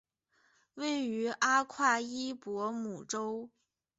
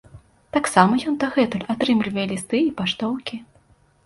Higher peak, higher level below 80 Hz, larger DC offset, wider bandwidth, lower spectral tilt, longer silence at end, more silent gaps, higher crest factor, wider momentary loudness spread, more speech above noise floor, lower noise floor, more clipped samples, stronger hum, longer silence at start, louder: second, -16 dBFS vs 0 dBFS; second, -80 dBFS vs -56 dBFS; neither; second, 8 kHz vs 11.5 kHz; second, -1.5 dB/octave vs -5 dB/octave; about the same, 0.5 s vs 0.6 s; neither; about the same, 20 dB vs 22 dB; about the same, 11 LU vs 10 LU; first, 40 dB vs 36 dB; first, -73 dBFS vs -57 dBFS; neither; neither; first, 0.75 s vs 0.15 s; second, -33 LUFS vs -21 LUFS